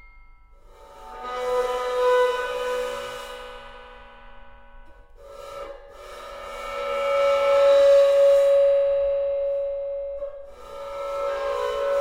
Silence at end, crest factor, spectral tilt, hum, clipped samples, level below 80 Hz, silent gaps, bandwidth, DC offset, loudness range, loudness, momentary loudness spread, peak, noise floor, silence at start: 0 s; 14 dB; -2.5 dB/octave; none; under 0.1%; -50 dBFS; none; 13.5 kHz; under 0.1%; 20 LU; -22 LUFS; 23 LU; -8 dBFS; -49 dBFS; 0.15 s